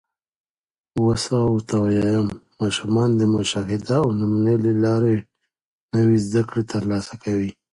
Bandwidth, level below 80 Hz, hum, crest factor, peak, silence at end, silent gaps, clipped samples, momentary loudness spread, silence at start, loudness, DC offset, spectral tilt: 11.5 kHz; -48 dBFS; none; 14 dB; -8 dBFS; 0.2 s; 5.62-5.89 s; under 0.1%; 7 LU; 0.95 s; -21 LUFS; under 0.1%; -6.5 dB/octave